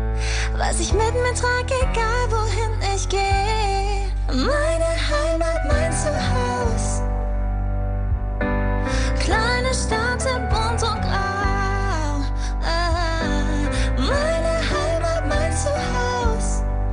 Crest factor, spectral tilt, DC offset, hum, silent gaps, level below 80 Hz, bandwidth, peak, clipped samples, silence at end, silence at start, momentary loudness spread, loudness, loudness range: 14 dB; -4.5 dB/octave; under 0.1%; none; none; -24 dBFS; 10 kHz; -6 dBFS; under 0.1%; 0 s; 0 s; 5 LU; -22 LUFS; 2 LU